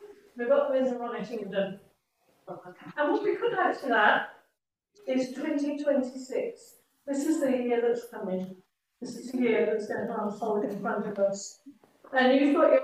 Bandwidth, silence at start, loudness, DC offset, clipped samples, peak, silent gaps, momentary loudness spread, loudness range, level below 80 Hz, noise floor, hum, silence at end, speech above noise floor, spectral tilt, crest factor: 15 kHz; 0 s; -28 LUFS; under 0.1%; under 0.1%; -10 dBFS; none; 19 LU; 3 LU; -80 dBFS; -78 dBFS; none; 0 s; 50 dB; -5 dB/octave; 20 dB